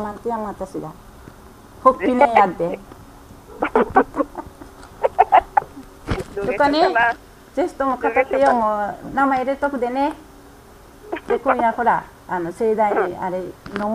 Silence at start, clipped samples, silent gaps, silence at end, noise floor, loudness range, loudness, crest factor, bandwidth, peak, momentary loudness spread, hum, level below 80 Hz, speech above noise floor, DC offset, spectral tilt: 0 s; under 0.1%; none; 0 s; -44 dBFS; 3 LU; -20 LUFS; 20 dB; 15.5 kHz; 0 dBFS; 15 LU; none; -44 dBFS; 25 dB; under 0.1%; -6 dB/octave